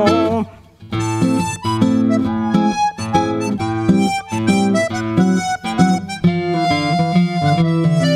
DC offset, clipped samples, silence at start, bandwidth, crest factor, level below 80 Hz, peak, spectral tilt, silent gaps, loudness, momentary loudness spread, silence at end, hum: under 0.1%; under 0.1%; 0 s; 13 kHz; 16 dB; -46 dBFS; 0 dBFS; -6 dB/octave; none; -17 LUFS; 5 LU; 0 s; none